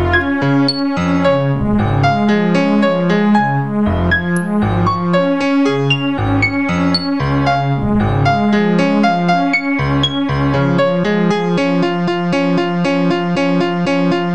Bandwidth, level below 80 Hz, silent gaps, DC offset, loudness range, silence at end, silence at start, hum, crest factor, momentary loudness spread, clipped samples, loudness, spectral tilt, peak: 12 kHz; -36 dBFS; none; 1%; 1 LU; 0 s; 0 s; none; 14 dB; 3 LU; under 0.1%; -14 LUFS; -7 dB/octave; 0 dBFS